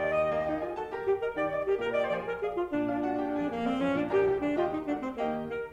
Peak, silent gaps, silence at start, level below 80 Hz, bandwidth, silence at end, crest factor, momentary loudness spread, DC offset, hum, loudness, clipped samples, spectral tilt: -16 dBFS; none; 0 s; -58 dBFS; 8.4 kHz; 0 s; 14 dB; 6 LU; under 0.1%; none; -30 LUFS; under 0.1%; -7 dB/octave